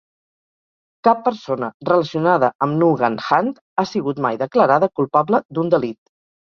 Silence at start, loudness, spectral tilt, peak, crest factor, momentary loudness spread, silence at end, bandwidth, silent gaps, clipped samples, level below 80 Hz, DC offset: 1.05 s; -18 LUFS; -7.5 dB/octave; 0 dBFS; 18 dB; 7 LU; 0.55 s; 6.8 kHz; 1.74-1.80 s, 2.55-2.59 s, 3.61-3.76 s, 5.45-5.49 s; under 0.1%; -62 dBFS; under 0.1%